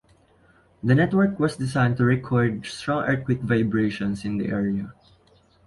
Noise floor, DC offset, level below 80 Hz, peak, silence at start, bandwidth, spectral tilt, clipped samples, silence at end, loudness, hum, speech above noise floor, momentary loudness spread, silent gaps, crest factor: -58 dBFS; under 0.1%; -52 dBFS; -6 dBFS; 0.85 s; 11.5 kHz; -7.5 dB/octave; under 0.1%; 0.75 s; -23 LUFS; none; 36 dB; 7 LU; none; 18 dB